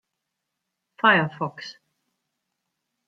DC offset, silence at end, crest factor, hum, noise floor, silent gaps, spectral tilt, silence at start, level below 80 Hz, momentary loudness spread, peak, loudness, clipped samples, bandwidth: under 0.1%; 1.35 s; 24 dB; none; -82 dBFS; none; -6 dB/octave; 1.05 s; -74 dBFS; 21 LU; -4 dBFS; -21 LUFS; under 0.1%; 7.6 kHz